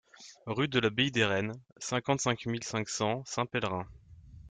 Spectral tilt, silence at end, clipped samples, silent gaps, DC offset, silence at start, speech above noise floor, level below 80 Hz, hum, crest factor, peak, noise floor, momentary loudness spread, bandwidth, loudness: -4 dB/octave; 0 s; under 0.1%; 1.72-1.76 s; under 0.1%; 0.2 s; 20 dB; -62 dBFS; none; 20 dB; -12 dBFS; -52 dBFS; 12 LU; 9.6 kHz; -31 LUFS